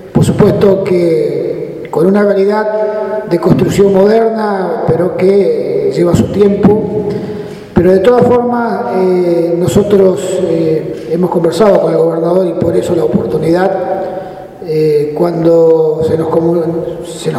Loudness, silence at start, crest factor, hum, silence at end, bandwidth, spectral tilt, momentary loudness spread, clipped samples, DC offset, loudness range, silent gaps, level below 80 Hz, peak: -11 LUFS; 0 s; 10 dB; none; 0 s; 15.5 kHz; -7.5 dB/octave; 9 LU; 0.3%; under 0.1%; 2 LU; none; -40 dBFS; 0 dBFS